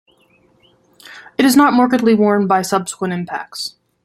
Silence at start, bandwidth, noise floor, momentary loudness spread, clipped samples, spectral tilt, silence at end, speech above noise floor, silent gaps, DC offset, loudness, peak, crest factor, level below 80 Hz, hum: 1.05 s; 16 kHz; -55 dBFS; 15 LU; under 0.1%; -5 dB/octave; 0.35 s; 41 dB; none; under 0.1%; -15 LUFS; -2 dBFS; 16 dB; -60 dBFS; none